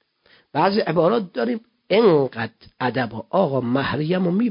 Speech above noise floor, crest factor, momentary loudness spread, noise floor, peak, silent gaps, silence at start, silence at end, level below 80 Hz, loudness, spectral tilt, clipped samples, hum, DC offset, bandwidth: 38 dB; 16 dB; 10 LU; -58 dBFS; -4 dBFS; none; 0.55 s; 0 s; -56 dBFS; -21 LUFS; -11.5 dB/octave; under 0.1%; none; under 0.1%; 5.4 kHz